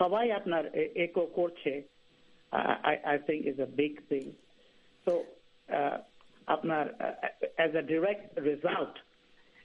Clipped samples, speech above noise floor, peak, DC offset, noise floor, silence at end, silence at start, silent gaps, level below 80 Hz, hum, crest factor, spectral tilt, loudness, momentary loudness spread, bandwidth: under 0.1%; 31 dB; -12 dBFS; under 0.1%; -63 dBFS; 0.65 s; 0 s; none; -76 dBFS; none; 22 dB; -7 dB/octave; -32 LUFS; 7 LU; 7.6 kHz